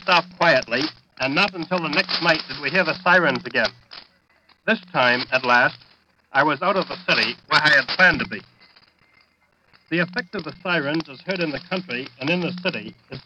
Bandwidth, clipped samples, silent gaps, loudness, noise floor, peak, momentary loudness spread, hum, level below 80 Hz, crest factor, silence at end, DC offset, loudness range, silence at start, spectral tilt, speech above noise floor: 10 kHz; under 0.1%; none; -20 LUFS; -63 dBFS; -4 dBFS; 12 LU; none; -58 dBFS; 18 dB; 0.05 s; under 0.1%; 7 LU; 0.05 s; -5 dB/octave; 41 dB